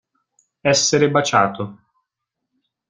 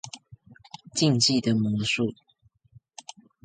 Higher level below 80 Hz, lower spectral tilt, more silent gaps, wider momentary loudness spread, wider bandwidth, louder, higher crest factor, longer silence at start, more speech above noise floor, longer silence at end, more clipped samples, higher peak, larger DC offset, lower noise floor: about the same, -60 dBFS vs -62 dBFS; about the same, -3.5 dB/octave vs -4 dB/octave; neither; second, 13 LU vs 25 LU; about the same, 10 kHz vs 9.6 kHz; first, -17 LUFS vs -24 LUFS; about the same, 18 dB vs 18 dB; first, 0.65 s vs 0.05 s; first, 63 dB vs 34 dB; second, 1.15 s vs 1.3 s; neither; first, -2 dBFS vs -10 dBFS; neither; first, -80 dBFS vs -58 dBFS